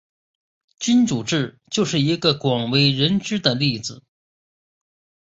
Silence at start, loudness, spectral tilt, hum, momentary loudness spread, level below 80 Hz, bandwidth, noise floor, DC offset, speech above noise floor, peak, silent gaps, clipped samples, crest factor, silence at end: 0.8 s; -20 LUFS; -5 dB/octave; none; 8 LU; -56 dBFS; 8 kHz; under -90 dBFS; under 0.1%; over 70 dB; -4 dBFS; none; under 0.1%; 18 dB; 1.3 s